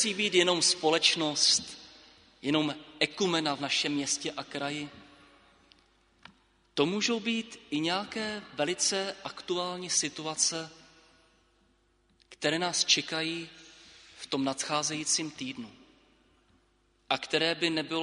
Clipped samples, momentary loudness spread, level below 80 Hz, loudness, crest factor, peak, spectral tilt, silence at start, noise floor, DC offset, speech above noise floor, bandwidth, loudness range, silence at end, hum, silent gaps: under 0.1%; 14 LU; -72 dBFS; -29 LUFS; 24 dB; -8 dBFS; -2 dB/octave; 0 s; -69 dBFS; under 0.1%; 39 dB; 10.5 kHz; 6 LU; 0 s; none; none